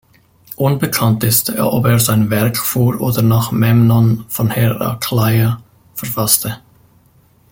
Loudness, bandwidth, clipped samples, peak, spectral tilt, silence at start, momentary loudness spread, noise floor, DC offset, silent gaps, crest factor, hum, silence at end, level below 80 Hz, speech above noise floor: -14 LUFS; 17 kHz; under 0.1%; 0 dBFS; -5.5 dB/octave; 0.5 s; 9 LU; -51 dBFS; under 0.1%; none; 14 dB; none; 0.95 s; -46 dBFS; 37 dB